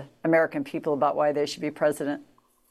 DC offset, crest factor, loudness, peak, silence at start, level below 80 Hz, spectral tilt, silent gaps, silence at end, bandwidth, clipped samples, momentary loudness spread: under 0.1%; 16 dB; -26 LUFS; -10 dBFS; 0 s; -72 dBFS; -5.5 dB/octave; none; 0.45 s; 13.5 kHz; under 0.1%; 8 LU